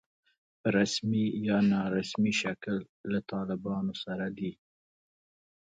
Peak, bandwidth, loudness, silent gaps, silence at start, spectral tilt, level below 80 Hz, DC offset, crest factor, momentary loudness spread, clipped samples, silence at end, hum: -12 dBFS; 9 kHz; -31 LUFS; 2.89-3.04 s; 0.65 s; -5.5 dB/octave; -66 dBFS; under 0.1%; 18 dB; 9 LU; under 0.1%; 1.1 s; none